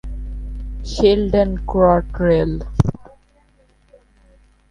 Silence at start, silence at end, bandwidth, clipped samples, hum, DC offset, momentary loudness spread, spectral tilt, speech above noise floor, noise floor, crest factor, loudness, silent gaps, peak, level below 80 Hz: 0.05 s; 1.7 s; 10 kHz; under 0.1%; 50 Hz at -30 dBFS; under 0.1%; 17 LU; -7.5 dB/octave; 39 dB; -55 dBFS; 20 dB; -17 LUFS; none; 0 dBFS; -28 dBFS